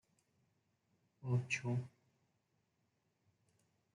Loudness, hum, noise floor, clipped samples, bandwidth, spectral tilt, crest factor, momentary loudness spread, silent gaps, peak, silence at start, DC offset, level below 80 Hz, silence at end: -40 LUFS; none; -82 dBFS; under 0.1%; 11 kHz; -6 dB/octave; 22 dB; 14 LU; none; -24 dBFS; 1.2 s; under 0.1%; -82 dBFS; 2.05 s